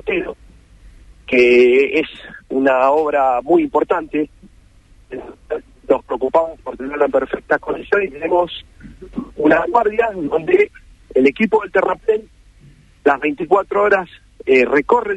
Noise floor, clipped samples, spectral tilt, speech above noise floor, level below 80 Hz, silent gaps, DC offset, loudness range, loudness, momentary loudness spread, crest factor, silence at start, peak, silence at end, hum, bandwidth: -48 dBFS; under 0.1%; -6.5 dB/octave; 32 dB; -46 dBFS; none; under 0.1%; 5 LU; -16 LUFS; 14 LU; 16 dB; 0.05 s; 0 dBFS; 0 s; none; 8.2 kHz